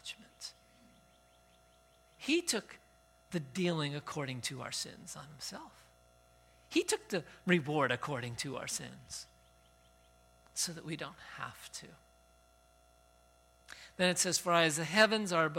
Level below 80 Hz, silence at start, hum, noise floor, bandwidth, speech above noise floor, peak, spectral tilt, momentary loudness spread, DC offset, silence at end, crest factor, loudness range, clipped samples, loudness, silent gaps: -70 dBFS; 0.05 s; none; -66 dBFS; 16.5 kHz; 31 dB; -10 dBFS; -3.5 dB/octave; 19 LU; under 0.1%; 0 s; 26 dB; 9 LU; under 0.1%; -34 LUFS; none